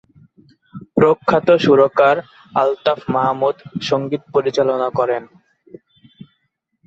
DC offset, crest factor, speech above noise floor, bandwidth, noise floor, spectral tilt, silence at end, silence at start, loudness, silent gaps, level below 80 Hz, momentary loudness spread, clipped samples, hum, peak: under 0.1%; 16 dB; 54 dB; 7.8 kHz; -70 dBFS; -6.5 dB/octave; 1.6 s; 0.75 s; -17 LUFS; none; -58 dBFS; 9 LU; under 0.1%; none; -2 dBFS